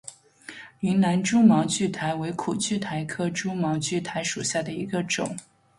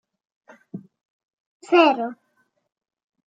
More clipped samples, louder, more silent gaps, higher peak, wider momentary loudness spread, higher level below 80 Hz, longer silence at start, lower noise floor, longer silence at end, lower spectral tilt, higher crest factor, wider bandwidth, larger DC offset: neither; second, -25 LUFS vs -19 LUFS; second, none vs 1.05-1.60 s; second, -6 dBFS vs -2 dBFS; second, 19 LU vs 24 LU; first, -62 dBFS vs -86 dBFS; second, 0.05 s vs 0.75 s; second, -46 dBFS vs -69 dBFS; second, 0.4 s vs 1.15 s; about the same, -4.5 dB/octave vs -5 dB/octave; about the same, 18 dB vs 22 dB; first, 11.5 kHz vs 7.8 kHz; neither